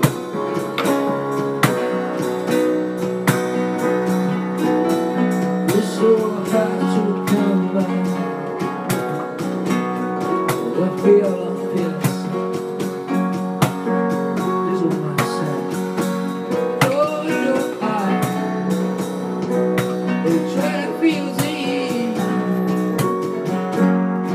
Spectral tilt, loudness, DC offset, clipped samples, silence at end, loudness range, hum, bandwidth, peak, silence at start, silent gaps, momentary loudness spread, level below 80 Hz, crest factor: -6.5 dB/octave; -20 LUFS; under 0.1%; under 0.1%; 0 s; 2 LU; none; 15.5 kHz; 0 dBFS; 0 s; none; 6 LU; -60 dBFS; 20 dB